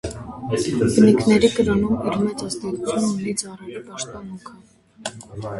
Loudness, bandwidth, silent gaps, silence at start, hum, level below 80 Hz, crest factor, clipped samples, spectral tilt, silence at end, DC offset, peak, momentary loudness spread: -20 LUFS; 11.5 kHz; none; 0.05 s; none; -46 dBFS; 18 dB; under 0.1%; -5.5 dB/octave; 0 s; under 0.1%; -2 dBFS; 19 LU